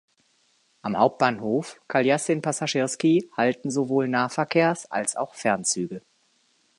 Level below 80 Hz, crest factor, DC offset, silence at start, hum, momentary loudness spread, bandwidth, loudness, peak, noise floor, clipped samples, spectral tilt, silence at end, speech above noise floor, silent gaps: -70 dBFS; 20 dB; under 0.1%; 0.85 s; none; 7 LU; 11.5 kHz; -24 LUFS; -4 dBFS; -66 dBFS; under 0.1%; -4.5 dB/octave; 0.8 s; 42 dB; none